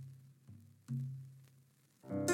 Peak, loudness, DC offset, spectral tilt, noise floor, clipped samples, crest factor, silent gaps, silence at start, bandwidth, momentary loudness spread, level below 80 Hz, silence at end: -20 dBFS; -44 LUFS; under 0.1%; -5.5 dB/octave; -69 dBFS; under 0.1%; 24 dB; none; 0 s; 17 kHz; 19 LU; -86 dBFS; 0 s